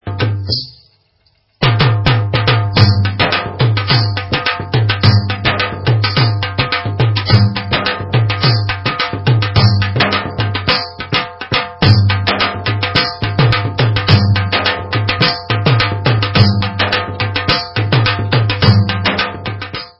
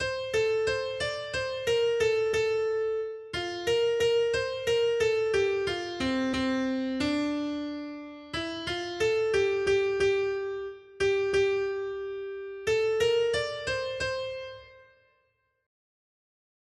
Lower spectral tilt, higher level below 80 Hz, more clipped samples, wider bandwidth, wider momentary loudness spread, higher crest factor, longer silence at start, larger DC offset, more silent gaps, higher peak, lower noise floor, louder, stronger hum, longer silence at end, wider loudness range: first, -7.5 dB/octave vs -4 dB/octave; first, -32 dBFS vs -56 dBFS; neither; second, 5.8 kHz vs 12.5 kHz; second, 6 LU vs 10 LU; about the same, 14 dB vs 14 dB; about the same, 0.05 s vs 0 s; neither; neither; first, 0 dBFS vs -14 dBFS; second, -57 dBFS vs -73 dBFS; first, -14 LUFS vs -28 LUFS; neither; second, 0.1 s vs 1.85 s; about the same, 1 LU vs 3 LU